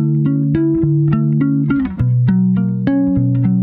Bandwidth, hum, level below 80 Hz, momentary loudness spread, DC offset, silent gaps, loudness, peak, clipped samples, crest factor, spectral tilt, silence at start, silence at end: 3.9 kHz; none; -38 dBFS; 2 LU; under 0.1%; none; -15 LUFS; -4 dBFS; under 0.1%; 10 dB; -13 dB/octave; 0 s; 0 s